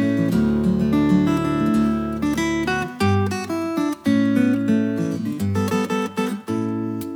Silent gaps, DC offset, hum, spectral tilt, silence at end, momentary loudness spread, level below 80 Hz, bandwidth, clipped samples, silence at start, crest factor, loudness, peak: none; under 0.1%; none; -6.5 dB/octave; 0 s; 7 LU; -44 dBFS; 19 kHz; under 0.1%; 0 s; 14 dB; -21 LUFS; -6 dBFS